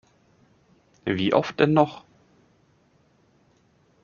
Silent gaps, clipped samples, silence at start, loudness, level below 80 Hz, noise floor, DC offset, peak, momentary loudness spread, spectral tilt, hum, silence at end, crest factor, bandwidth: none; under 0.1%; 1.05 s; -23 LUFS; -64 dBFS; -62 dBFS; under 0.1%; -4 dBFS; 13 LU; -5 dB/octave; none; 2.05 s; 24 dB; 7.2 kHz